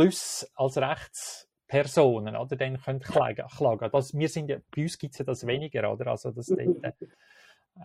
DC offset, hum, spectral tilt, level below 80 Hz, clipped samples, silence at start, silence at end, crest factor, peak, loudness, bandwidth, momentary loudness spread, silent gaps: under 0.1%; none; -5.5 dB/octave; -64 dBFS; under 0.1%; 0 s; 0 s; 20 dB; -8 dBFS; -29 LUFS; 16 kHz; 11 LU; none